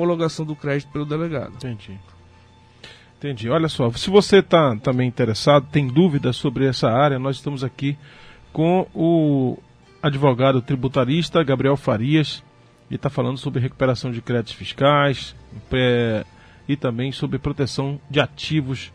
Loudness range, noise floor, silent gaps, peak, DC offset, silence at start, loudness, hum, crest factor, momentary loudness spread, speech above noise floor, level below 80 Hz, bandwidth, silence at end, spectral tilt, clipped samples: 6 LU; -50 dBFS; none; -2 dBFS; under 0.1%; 0 s; -20 LUFS; none; 20 dB; 12 LU; 30 dB; -48 dBFS; 10.5 kHz; 0.05 s; -6.5 dB/octave; under 0.1%